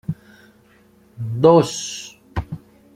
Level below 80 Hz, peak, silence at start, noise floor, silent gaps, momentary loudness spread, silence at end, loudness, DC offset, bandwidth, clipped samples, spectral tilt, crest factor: -44 dBFS; -2 dBFS; 0.1 s; -53 dBFS; none; 22 LU; 0.4 s; -19 LUFS; under 0.1%; 15 kHz; under 0.1%; -6 dB/octave; 20 dB